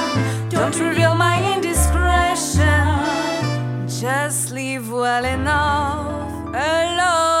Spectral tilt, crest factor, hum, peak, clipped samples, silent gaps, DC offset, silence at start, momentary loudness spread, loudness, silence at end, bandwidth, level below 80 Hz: -4.5 dB/octave; 16 dB; none; -4 dBFS; under 0.1%; none; under 0.1%; 0 s; 8 LU; -19 LUFS; 0 s; 16.5 kHz; -32 dBFS